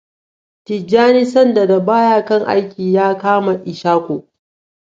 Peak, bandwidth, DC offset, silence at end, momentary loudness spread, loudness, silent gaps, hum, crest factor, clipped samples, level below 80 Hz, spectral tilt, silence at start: 0 dBFS; 7.8 kHz; under 0.1%; 0.75 s; 10 LU; -14 LUFS; none; none; 14 dB; under 0.1%; -62 dBFS; -7 dB/octave; 0.7 s